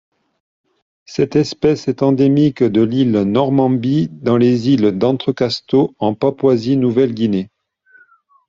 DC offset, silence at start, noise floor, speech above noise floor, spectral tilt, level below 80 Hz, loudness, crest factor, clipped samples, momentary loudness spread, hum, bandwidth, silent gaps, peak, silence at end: under 0.1%; 1.1 s; -52 dBFS; 37 dB; -7.5 dB/octave; -54 dBFS; -15 LUFS; 14 dB; under 0.1%; 5 LU; none; 7.4 kHz; none; -2 dBFS; 1 s